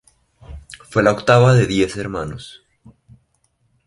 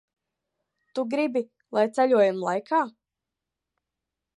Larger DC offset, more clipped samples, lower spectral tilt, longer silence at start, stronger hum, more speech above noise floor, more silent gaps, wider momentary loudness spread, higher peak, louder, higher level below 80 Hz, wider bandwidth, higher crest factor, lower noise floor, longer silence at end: neither; neither; about the same, -6.5 dB/octave vs -6 dB/octave; second, 0.5 s vs 0.95 s; neither; second, 49 dB vs 63 dB; neither; first, 26 LU vs 11 LU; first, 0 dBFS vs -10 dBFS; first, -16 LUFS vs -25 LUFS; first, -44 dBFS vs -84 dBFS; about the same, 11.5 kHz vs 11.5 kHz; about the same, 18 dB vs 18 dB; second, -64 dBFS vs -86 dBFS; second, 1.35 s vs 1.5 s